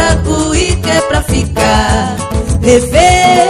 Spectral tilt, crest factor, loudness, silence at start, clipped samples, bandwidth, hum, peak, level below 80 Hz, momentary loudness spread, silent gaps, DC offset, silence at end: -4.5 dB/octave; 10 dB; -10 LUFS; 0 s; 0.5%; 14.5 kHz; none; 0 dBFS; -18 dBFS; 7 LU; none; under 0.1%; 0 s